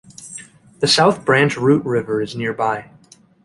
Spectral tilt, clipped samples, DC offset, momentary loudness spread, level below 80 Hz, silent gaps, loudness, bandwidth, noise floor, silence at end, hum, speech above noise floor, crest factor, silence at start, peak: -4.5 dB/octave; under 0.1%; under 0.1%; 20 LU; -56 dBFS; none; -17 LUFS; 11.5 kHz; -39 dBFS; 0.6 s; none; 22 dB; 16 dB; 0.2 s; -2 dBFS